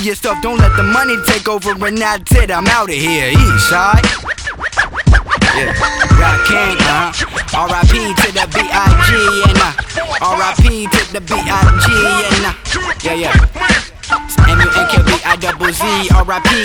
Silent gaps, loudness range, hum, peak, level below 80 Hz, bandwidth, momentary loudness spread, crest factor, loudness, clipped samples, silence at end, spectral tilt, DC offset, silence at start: none; 1 LU; none; 0 dBFS; -18 dBFS; 19.5 kHz; 7 LU; 12 dB; -12 LUFS; under 0.1%; 0 s; -4.5 dB/octave; under 0.1%; 0 s